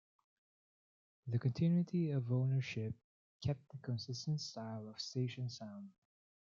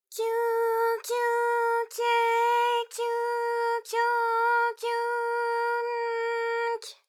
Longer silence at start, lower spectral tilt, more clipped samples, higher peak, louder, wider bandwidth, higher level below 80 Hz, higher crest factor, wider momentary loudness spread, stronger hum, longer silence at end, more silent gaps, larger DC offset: first, 1.25 s vs 0.1 s; first, -7 dB/octave vs 3 dB/octave; neither; second, -24 dBFS vs -14 dBFS; second, -40 LUFS vs -27 LUFS; second, 7.4 kHz vs 16 kHz; first, -74 dBFS vs under -90 dBFS; about the same, 16 dB vs 14 dB; first, 15 LU vs 5 LU; neither; first, 0.65 s vs 0.15 s; first, 3.04-3.40 s vs none; neither